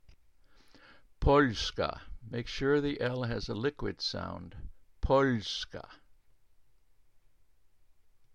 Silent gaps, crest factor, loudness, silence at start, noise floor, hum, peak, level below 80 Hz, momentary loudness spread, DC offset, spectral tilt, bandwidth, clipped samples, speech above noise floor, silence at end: none; 22 dB; -32 LUFS; 1.2 s; -68 dBFS; none; -12 dBFS; -46 dBFS; 17 LU; under 0.1%; -5.5 dB/octave; 9.4 kHz; under 0.1%; 36 dB; 2.4 s